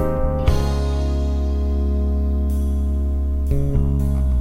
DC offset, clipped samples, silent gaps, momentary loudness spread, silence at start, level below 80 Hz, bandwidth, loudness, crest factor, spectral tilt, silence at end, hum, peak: under 0.1%; under 0.1%; none; 2 LU; 0 s; -20 dBFS; 9.8 kHz; -21 LUFS; 14 dB; -8.5 dB/octave; 0 s; none; -4 dBFS